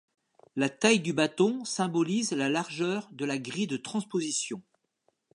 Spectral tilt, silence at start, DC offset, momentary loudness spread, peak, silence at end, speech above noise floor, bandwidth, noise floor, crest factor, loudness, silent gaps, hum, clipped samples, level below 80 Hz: -4 dB/octave; 0.55 s; under 0.1%; 9 LU; -8 dBFS; 0.75 s; 46 dB; 11.5 kHz; -75 dBFS; 22 dB; -29 LUFS; none; none; under 0.1%; -80 dBFS